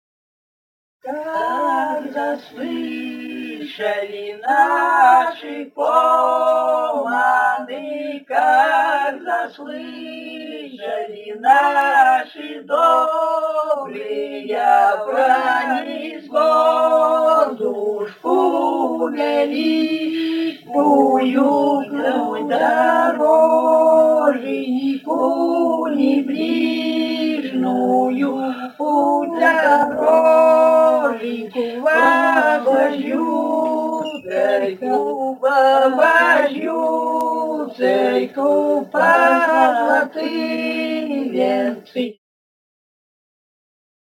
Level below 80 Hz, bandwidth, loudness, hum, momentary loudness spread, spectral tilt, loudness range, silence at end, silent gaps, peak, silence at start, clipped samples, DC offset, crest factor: -78 dBFS; 17 kHz; -17 LUFS; none; 13 LU; -4.5 dB/octave; 5 LU; 2 s; none; 0 dBFS; 1.05 s; under 0.1%; under 0.1%; 16 dB